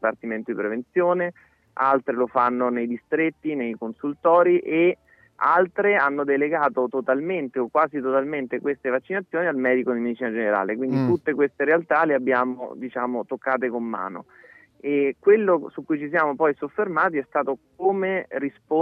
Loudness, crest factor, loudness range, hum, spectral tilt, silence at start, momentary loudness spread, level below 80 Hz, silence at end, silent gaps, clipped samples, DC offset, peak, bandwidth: -23 LUFS; 16 dB; 3 LU; none; -9 dB/octave; 0 s; 9 LU; -72 dBFS; 0 s; none; under 0.1%; under 0.1%; -6 dBFS; 5.6 kHz